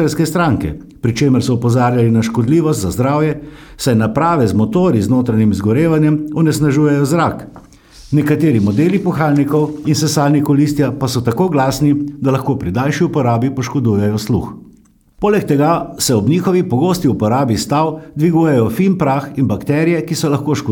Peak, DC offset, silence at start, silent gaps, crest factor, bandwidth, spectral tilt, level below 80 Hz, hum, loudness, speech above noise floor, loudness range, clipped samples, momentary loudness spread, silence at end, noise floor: 0 dBFS; under 0.1%; 0 s; none; 12 dB; 18.5 kHz; -6.5 dB/octave; -42 dBFS; none; -14 LUFS; 34 dB; 2 LU; under 0.1%; 5 LU; 0 s; -47 dBFS